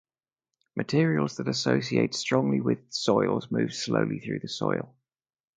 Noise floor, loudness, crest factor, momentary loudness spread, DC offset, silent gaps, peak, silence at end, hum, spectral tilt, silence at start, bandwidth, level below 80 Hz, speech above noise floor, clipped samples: -89 dBFS; -27 LUFS; 20 dB; 9 LU; under 0.1%; none; -8 dBFS; 0.7 s; none; -5.5 dB/octave; 0.75 s; 9.4 kHz; -66 dBFS; 62 dB; under 0.1%